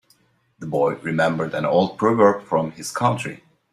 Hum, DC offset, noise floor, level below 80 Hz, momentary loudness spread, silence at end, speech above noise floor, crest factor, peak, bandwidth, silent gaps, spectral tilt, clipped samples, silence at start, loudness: none; under 0.1%; -61 dBFS; -62 dBFS; 11 LU; 0.35 s; 41 dB; 20 dB; -2 dBFS; 14 kHz; none; -6 dB/octave; under 0.1%; 0.6 s; -21 LUFS